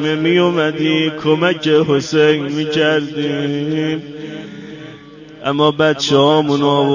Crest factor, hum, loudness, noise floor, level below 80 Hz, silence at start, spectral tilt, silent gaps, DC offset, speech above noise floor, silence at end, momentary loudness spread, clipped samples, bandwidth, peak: 16 dB; none; -15 LUFS; -37 dBFS; -56 dBFS; 0 s; -5.5 dB/octave; none; under 0.1%; 22 dB; 0 s; 16 LU; under 0.1%; 7.4 kHz; 0 dBFS